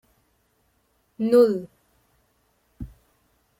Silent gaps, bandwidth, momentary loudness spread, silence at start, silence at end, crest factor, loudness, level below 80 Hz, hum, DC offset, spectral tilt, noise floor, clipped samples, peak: none; 15.5 kHz; 25 LU; 1.2 s; 0.75 s; 20 dB; -21 LUFS; -54 dBFS; none; under 0.1%; -7.5 dB/octave; -68 dBFS; under 0.1%; -6 dBFS